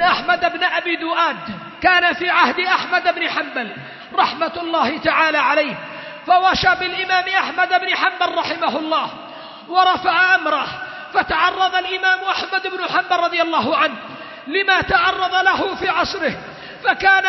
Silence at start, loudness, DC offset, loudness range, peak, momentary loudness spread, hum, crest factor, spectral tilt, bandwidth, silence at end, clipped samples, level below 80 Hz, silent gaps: 0 s; -17 LUFS; under 0.1%; 2 LU; 0 dBFS; 12 LU; none; 18 dB; -3.5 dB/octave; 6.2 kHz; 0 s; under 0.1%; -50 dBFS; none